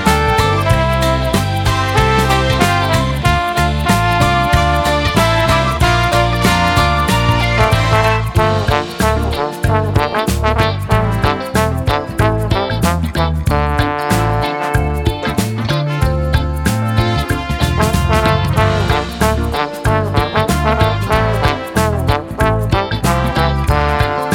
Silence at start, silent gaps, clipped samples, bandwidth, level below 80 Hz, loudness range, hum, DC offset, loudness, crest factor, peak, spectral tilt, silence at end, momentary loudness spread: 0 s; none; under 0.1%; 18 kHz; -22 dBFS; 3 LU; none; under 0.1%; -14 LUFS; 14 dB; 0 dBFS; -5.5 dB/octave; 0 s; 4 LU